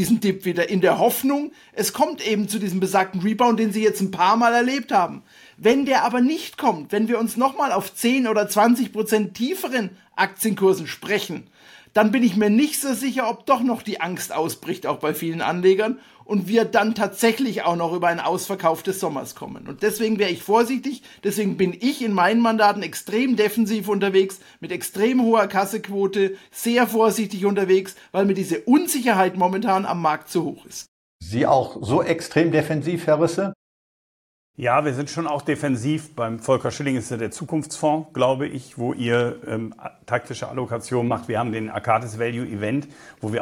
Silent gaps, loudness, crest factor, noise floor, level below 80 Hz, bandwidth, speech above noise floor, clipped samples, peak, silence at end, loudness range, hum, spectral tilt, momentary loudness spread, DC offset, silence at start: 30.88-31.19 s, 33.55-34.54 s; -21 LUFS; 16 dB; under -90 dBFS; -62 dBFS; 17 kHz; over 69 dB; under 0.1%; -4 dBFS; 0 s; 4 LU; none; -5 dB/octave; 10 LU; under 0.1%; 0 s